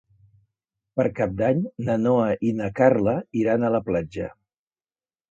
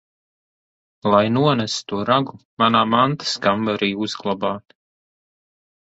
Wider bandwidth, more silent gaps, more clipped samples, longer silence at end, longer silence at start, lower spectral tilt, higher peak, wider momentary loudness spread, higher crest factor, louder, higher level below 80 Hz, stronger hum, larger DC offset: about the same, 7.6 kHz vs 8.2 kHz; second, none vs 2.45-2.57 s; neither; second, 1 s vs 1.35 s; about the same, 0.95 s vs 1.05 s; first, -9 dB/octave vs -5 dB/octave; about the same, -4 dBFS vs -2 dBFS; about the same, 9 LU vs 9 LU; about the same, 20 dB vs 20 dB; second, -23 LUFS vs -19 LUFS; first, -52 dBFS vs -58 dBFS; neither; neither